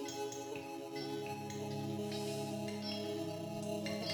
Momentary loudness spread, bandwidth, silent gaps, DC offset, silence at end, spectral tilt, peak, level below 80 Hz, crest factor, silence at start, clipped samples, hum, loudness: 4 LU; 18 kHz; none; under 0.1%; 0 s; -5 dB/octave; -26 dBFS; -80 dBFS; 14 dB; 0 s; under 0.1%; none; -42 LUFS